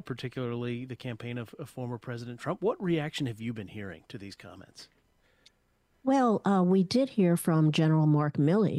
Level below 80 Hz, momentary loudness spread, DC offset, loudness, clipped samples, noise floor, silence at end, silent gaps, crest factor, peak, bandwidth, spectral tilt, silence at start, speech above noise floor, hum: -68 dBFS; 18 LU; under 0.1%; -29 LUFS; under 0.1%; -71 dBFS; 0 s; none; 16 dB; -14 dBFS; 12.5 kHz; -7 dB/octave; 0.05 s; 42 dB; none